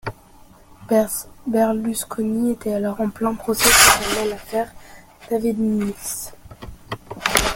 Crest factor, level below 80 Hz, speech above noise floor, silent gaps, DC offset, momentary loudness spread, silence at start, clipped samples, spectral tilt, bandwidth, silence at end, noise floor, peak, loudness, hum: 22 dB; -42 dBFS; 28 dB; none; under 0.1%; 19 LU; 0.05 s; under 0.1%; -2.5 dB/octave; 17 kHz; 0 s; -47 dBFS; 0 dBFS; -19 LUFS; none